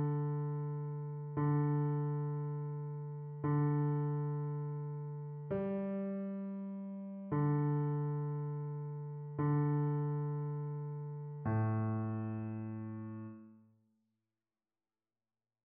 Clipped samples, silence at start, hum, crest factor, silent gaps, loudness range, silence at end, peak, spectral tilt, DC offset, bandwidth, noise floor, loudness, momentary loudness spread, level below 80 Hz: under 0.1%; 0 s; none; 14 dB; none; 4 LU; 2.05 s; -24 dBFS; -11.5 dB/octave; under 0.1%; 2.8 kHz; under -90 dBFS; -38 LUFS; 11 LU; -72 dBFS